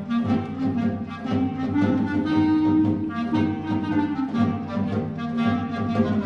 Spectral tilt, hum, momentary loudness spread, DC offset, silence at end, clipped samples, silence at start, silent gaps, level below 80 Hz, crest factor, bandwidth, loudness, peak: -8.5 dB/octave; none; 6 LU; under 0.1%; 0 s; under 0.1%; 0 s; none; -46 dBFS; 14 dB; 6.6 kHz; -24 LUFS; -8 dBFS